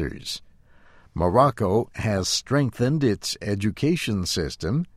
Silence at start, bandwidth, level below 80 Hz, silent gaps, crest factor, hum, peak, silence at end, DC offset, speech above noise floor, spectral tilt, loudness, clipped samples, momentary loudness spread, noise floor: 0 s; 15.5 kHz; -44 dBFS; none; 20 dB; none; -4 dBFS; 0.1 s; under 0.1%; 28 dB; -5 dB/octave; -24 LUFS; under 0.1%; 10 LU; -52 dBFS